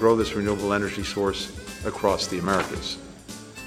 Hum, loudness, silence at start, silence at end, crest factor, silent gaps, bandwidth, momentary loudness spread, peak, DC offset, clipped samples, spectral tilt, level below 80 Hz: none; -26 LUFS; 0 s; 0 s; 20 dB; none; 16 kHz; 12 LU; -6 dBFS; under 0.1%; under 0.1%; -4.5 dB/octave; -44 dBFS